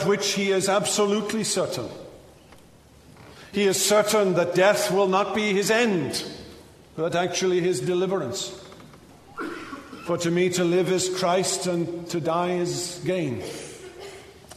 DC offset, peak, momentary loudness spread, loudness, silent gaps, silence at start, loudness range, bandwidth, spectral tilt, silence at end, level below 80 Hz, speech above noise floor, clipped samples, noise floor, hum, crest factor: under 0.1%; -6 dBFS; 17 LU; -23 LUFS; none; 0 s; 6 LU; 13.5 kHz; -4 dB/octave; 0 s; -60 dBFS; 28 dB; under 0.1%; -51 dBFS; none; 18 dB